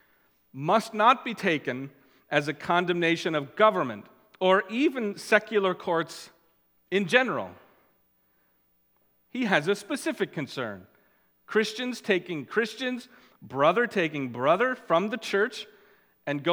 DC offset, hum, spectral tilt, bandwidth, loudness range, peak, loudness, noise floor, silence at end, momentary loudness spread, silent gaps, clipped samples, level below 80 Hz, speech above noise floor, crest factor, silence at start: under 0.1%; none; -5 dB/octave; 19 kHz; 6 LU; -4 dBFS; -26 LUFS; -68 dBFS; 0 s; 14 LU; none; under 0.1%; -78 dBFS; 42 dB; 24 dB; 0.55 s